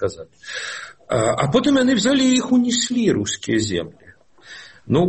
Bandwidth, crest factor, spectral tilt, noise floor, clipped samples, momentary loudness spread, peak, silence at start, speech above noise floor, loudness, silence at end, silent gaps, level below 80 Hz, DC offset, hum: 8.8 kHz; 16 dB; -4.5 dB/octave; -45 dBFS; under 0.1%; 19 LU; -4 dBFS; 0 s; 26 dB; -19 LUFS; 0 s; none; -50 dBFS; 0.1%; none